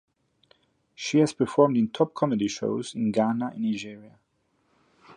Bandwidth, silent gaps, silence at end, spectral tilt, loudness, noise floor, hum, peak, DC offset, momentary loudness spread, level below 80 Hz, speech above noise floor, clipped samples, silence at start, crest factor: 11 kHz; none; 0.05 s; -6 dB/octave; -25 LUFS; -71 dBFS; none; -6 dBFS; under 0.1%; 8 LU; -68 dBFS; 46 dB; under 0.1%; 1 s; 20 dB